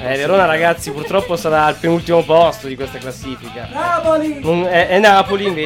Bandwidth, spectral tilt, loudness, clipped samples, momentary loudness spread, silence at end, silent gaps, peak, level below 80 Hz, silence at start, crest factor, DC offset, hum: 16.5 kHz; -5 dB/octave; -14 LUFS; under 0.1%; 16 LU; 0 s; none; -2 dBFS; -44 dBFS; 0 s; 14 dB; under 0.1%; none